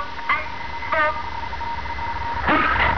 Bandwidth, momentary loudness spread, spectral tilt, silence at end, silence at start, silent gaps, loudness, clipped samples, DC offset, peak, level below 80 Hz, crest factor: 5.4 kHz; 11 LU; -5.5 dB/octave; 0 s; 0 s; none; -23 LUFS; under 0.1%; 3%; -6 dBFS; -36 dBFS; 16 dB